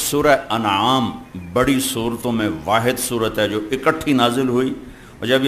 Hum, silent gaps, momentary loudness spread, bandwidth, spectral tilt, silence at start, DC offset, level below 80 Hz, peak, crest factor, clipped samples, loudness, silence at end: none; none; 8 LU; 15 kHz; -4 dB/octave; 0 s; under 0.1%; -44 dBFS; -2 dBFS; 18 dB; under 0.1%; -19 LUFS; 0 s